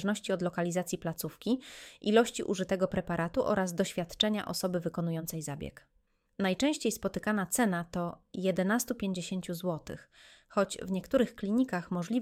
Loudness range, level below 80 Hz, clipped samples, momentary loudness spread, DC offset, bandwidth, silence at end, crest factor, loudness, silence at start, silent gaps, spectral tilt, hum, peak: 3 LU; -60 dBFS; under 0.1%; 8 LU; under 0.1%; 17 kHz; 0 s; 22 dB; -32 LUFS; 0 s; none; -5 dB/octave; none; -10 dBFS